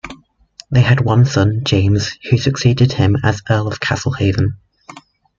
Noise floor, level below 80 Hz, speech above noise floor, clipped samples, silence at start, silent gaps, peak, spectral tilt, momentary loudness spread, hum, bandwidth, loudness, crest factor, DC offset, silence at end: -43 dBFS; -42 dBFS; 29 dB; under 0.1%; 0.05 s; none; -2 dBFS; -6 dB/octave; 6 LU; none; 7.4 kHz; -15 LUFS; 14 dB; under 0.1%; 0.4 s